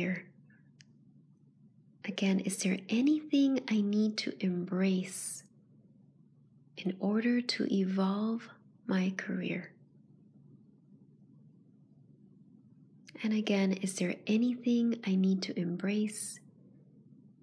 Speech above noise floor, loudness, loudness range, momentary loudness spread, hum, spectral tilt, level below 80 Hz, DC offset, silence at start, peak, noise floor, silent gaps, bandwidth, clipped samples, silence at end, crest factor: 31 dB; -32 LUFS; 8 LU; 11 LU; none; -5.5 dB/octave; -90 dBFS; under 0.1%; 0 s; -16 dBFS; -63 dBFS; none; 11 kHz; under 0.1%; 1.05 s; 18 dB